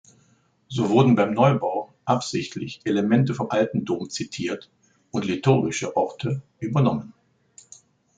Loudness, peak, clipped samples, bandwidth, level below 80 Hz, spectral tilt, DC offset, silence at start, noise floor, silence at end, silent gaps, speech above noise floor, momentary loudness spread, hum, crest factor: -23 LUFS; -4 dBFS; under 0.1%; 9.2 kHz; -62 dBFS; -6.5 dB/octave; under 0.1%; 0.7 s; -62 dBFS; 1.05 s; none; 40 dB; 12 LU; none; 20 dB